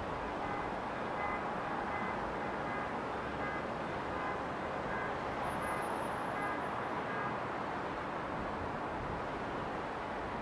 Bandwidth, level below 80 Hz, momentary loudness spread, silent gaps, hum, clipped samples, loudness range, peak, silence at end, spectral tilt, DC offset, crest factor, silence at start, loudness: 11 kHz; -56 dBFS; 2 LU; none; none; under 0.1%; 1 LU; -24 dBFS; 0 s; -6 dB/octave; under 0.1%; 14 dB; 0 s; -38 LUFS